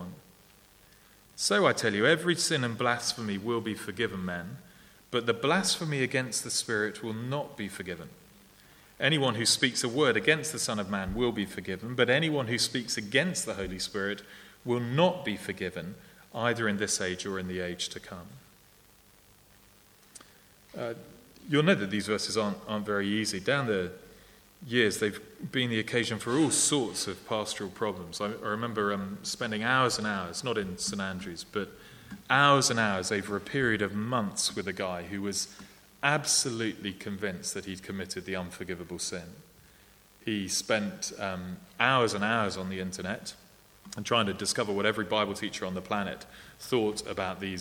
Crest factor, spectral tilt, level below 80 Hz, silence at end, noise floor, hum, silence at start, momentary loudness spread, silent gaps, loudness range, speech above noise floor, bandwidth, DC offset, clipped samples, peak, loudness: 24 dB; -3.5 dB/octave; -60 dBFS; 0 s; -59 dBFS; none; 0 s; 14 LU; none; 7 LU; 29 dB; over 20 kHz; under 0.1%; under 0.1%; -6 dBFS; -29 LUFS